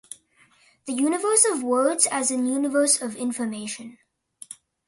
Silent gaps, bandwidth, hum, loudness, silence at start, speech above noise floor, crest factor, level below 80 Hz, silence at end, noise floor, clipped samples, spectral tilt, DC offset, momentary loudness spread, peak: none; 12 kHz; none; -22 LUFS; 0.85 s; 37 dB; 22 dB; -74 dBFS; 0.35 s; -60 dBFS; under 0.1%; -2 dB/octave; under 0.1%; 23 LU; -4 dBFS